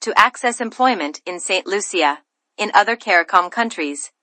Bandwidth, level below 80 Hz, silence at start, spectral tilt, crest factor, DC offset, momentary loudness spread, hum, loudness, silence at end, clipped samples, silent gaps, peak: 11.5 kHz; -68 dBFS; 0 s; -1.5 dB/octave; 18 dB; under 0.1%; 11 LU; none; -18 LUFS; 0.15 s; under 0.1%; none; 0 dBFS